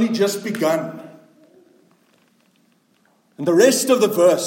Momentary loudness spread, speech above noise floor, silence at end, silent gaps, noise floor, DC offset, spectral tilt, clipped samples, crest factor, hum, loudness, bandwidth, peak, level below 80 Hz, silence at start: 12 LU; 43 dB; 0 s; none; -60 dBFS; under 0.1%; -4 dB/octave; under 0.1%; 18 dB; none; -17 LUFS; 17 kHz; -2 dBFS; -72 dBFS; 0 s